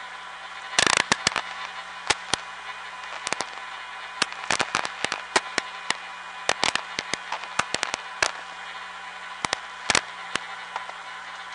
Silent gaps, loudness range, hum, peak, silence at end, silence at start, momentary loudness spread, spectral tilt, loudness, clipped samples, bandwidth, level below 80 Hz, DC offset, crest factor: none; 4 LU; 60 Hz at -65 dBFS; 0 dBFS; 0 s; 0 s; 13 LU; -0.5 dB/octave; -27 LUFS; under 0.1%; 11.5 kHz; -60 dBFS; under 0.1%; 28 dB